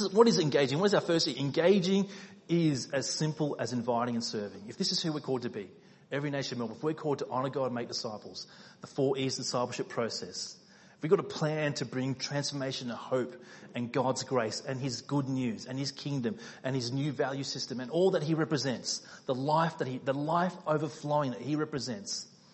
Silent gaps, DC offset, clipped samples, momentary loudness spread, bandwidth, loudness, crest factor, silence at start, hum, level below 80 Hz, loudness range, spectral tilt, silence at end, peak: none; under 0.1%; under 0.1%; 12 LU; 8.6 kHz; -32 LUFS; 24 dB; 0 s; none; -74 dBFS; 5 LU; -5 dB/octave; 0.25 s; -8 dBFS